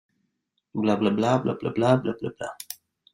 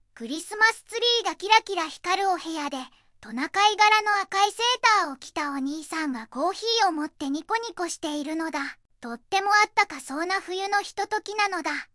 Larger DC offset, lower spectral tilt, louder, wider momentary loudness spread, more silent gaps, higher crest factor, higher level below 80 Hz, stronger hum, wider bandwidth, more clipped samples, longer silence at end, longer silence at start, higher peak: neither; first, -6.5 dB/octave vs -0.5 dB/octave; about the same, -25 LUFS vs -24 LUFS; first, 16 LU vs 12 LU; neither; about the same, 20 dB vs 22 dB; about the same, -64 dBFS vs -68 dBFS; neither; first, 16 kHz vs 12 kHz; neither; first, 0.4 s vs 0.1 s; first, 0.75 s vs 0.15 s; about the same, -6 dBFS vs -4 dBFS